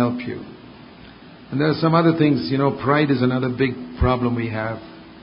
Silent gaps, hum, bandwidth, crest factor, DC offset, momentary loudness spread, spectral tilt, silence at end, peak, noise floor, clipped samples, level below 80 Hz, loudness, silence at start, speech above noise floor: none; none; 5.4 kHz; 18 dB; under 0.1%; 14 LU; -12 dB/octave; 0.05 s; -2 dBFS; -43 dBFS; under 0.1%; -38 dBFS; -20 LUFS; 0 s; 23 dB